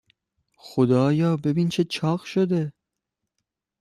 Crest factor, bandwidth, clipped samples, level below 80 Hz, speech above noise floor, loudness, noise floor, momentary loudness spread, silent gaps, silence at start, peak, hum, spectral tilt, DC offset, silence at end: 16 dB; 12.5 kHz; under 0.1%; -62 dBFS; 62 dB; -23 LUFS; -83 dBFS; 7 LU; none; 0.65 s; -8 dBFS; none; -7.5 dB/octave; under 0.1%; 1.1 s